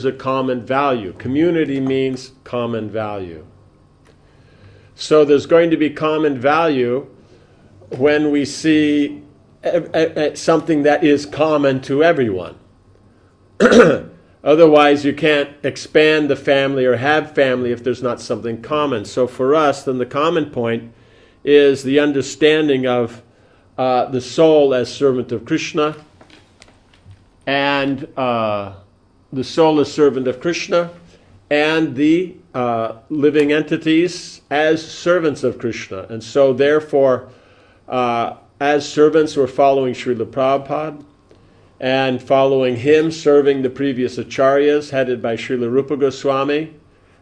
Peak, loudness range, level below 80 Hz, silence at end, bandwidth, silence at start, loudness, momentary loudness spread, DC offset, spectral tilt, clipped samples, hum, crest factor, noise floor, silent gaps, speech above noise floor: 0 dBFS; 5 LU; -54 dBFS; 0.5 s; 10.5 kHz; 0 s; -16 LUFS; 11 LU; under 0.1%; -5.5 dB/octave; under 0.1%; none; 16 dB; -51 dBFS; none; 35 dB